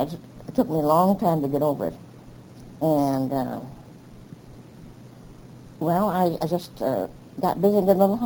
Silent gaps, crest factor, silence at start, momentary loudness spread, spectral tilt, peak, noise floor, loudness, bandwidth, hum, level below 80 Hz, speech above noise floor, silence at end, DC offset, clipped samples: none; 18 dB; 0 s; 22 LU; -8 dB/octave; -6 dBFS; -45 dBFS; -23 LUFS; over 20 kHz; none; -54 dBFS; 23 dB; 0 s; under 0.1%; under 0.1%